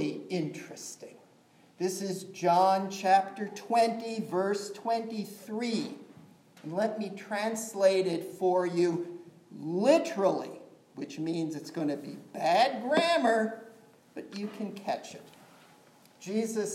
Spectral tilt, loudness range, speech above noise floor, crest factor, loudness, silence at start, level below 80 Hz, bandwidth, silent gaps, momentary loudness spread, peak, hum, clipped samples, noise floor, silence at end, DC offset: -4.5 dB/octave; 5 LU; 31 dB; 20 dB; -30 LUFS; 0 s; -88 dBFS; 16 kHz; none; 18 LU; -10 dBFS; none; under 0.1%; -61 dBFS; 0 s; under 0.1%